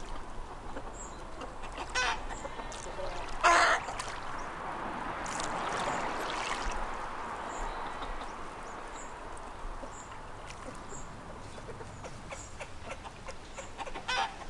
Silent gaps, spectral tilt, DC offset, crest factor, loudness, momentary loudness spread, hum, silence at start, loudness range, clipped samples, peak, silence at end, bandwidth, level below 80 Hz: none; -2.5 dB/octave; under 0.1%; 24 dB; -36 LUFS; 14 LU; none; 0 s; 14 LU; under 0.1%; -12 dBFS; 0 s; 12 kHz; -46 dBFS